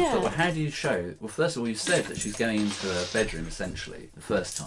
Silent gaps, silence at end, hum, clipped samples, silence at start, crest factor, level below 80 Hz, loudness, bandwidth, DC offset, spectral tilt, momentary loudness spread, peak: none; 0 s; none; under 0.1%; 0 s; 18 dB; -48 dBFS; -28 LUFS; 11.5 kHz; under 0.1%; -4 dB/octave; 9 LU; -10 dBFS